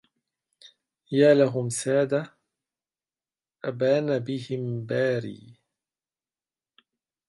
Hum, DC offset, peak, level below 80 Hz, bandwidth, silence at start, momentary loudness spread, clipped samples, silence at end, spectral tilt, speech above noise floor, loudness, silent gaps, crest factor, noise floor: none; under 0.1%; -6 dBFS; -74 dBFS; 11.5 kHz; 0.65 s; 14 LU; under 0.1%; 1.75 s; -6 dB/octave; over 66 dB; -25 LUFS; none; 22 dB; under -90 dBFS